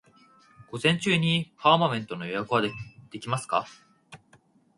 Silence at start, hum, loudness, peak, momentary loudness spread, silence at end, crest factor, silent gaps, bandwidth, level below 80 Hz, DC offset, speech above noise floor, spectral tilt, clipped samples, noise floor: 0.6 s; none; -26 LUFS; -4 dBFS; 18 LU; 0.6 s; 24 dB; none; 11.5 kHz; -66 dBFS; under 0.1%; 35 dB; -5 dB/octave; under 0.1%; -61 dBFS